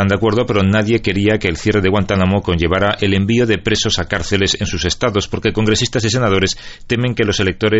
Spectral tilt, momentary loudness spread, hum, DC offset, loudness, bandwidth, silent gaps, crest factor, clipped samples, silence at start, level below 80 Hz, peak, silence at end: -5 dB/octave; 3 LU; none; under 0.1%; -15 LUFS; 8.2 kHz; none; 14 dB; under 0.1%; 0 s; -34 dBFS; -2 dBFS; 0 s